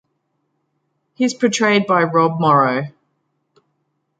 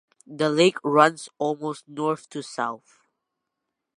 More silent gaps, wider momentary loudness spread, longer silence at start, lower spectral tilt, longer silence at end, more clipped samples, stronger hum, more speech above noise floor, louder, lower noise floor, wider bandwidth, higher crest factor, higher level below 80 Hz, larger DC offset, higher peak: neither; second, 8 LU vs 13 LU; first, 1.2 s vs 0.3 s; about the same, -5 dB/octave vs -4.5 dB/octave; about the same, 1.3 s vs 1.2 s; neither; neither; second, 54 dB vs 59 dB; first, -16 LUFS vs -24 LUFS; second, -70 dBFS vs -82 dBFS; second, 9.2 kHz vs 11.5 kHz; second, 18 dB vs 24 dB; first, -68 dBFS vs -80 dBFS; neither; about the same, -2 dBFS vs -2 dBFS